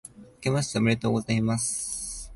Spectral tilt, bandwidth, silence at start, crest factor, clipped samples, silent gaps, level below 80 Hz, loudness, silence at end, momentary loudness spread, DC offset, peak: -4.5 dB/octave; 11.5 kHz; 0.05 s; 16 dB; under 0.1%; none; -50 dBFS; -27 LUFS; 0 s; 8 LU; under 0.1%; -10 dBFS